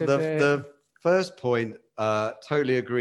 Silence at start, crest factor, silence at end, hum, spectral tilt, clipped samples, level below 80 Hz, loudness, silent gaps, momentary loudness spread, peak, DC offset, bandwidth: 0 s; 16 dB; 0 s; none; -6 dB/octave; under 0.1%; -72 dBFS; -26 LUFS; none; 6 LU; -8 dBFS; under 0.1%; 11.5 kHz